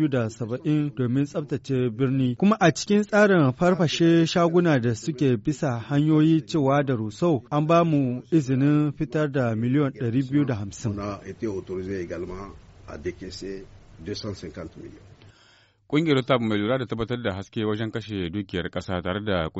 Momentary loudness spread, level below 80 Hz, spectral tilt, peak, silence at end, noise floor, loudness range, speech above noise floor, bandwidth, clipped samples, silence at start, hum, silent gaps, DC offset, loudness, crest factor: 15 LU; -52 dBFS; -6 dB/octave; -6 dBFS; 0 s; -58 dBFS; 13 LU; 35 dB; 8 kHz; under 0.1%; 0 s; none; none; under 0.1%; -24 LUFS; 18 dB